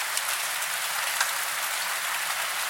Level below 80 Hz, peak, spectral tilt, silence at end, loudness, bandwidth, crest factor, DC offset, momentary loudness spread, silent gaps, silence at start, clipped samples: -84 dBFS; -6 dBFS; 3 dB/octave; 0 s; -26 LUFS; 17 kHz; 22 dB; under 0.1%; 2 LU; none; 0 s; under 0.1%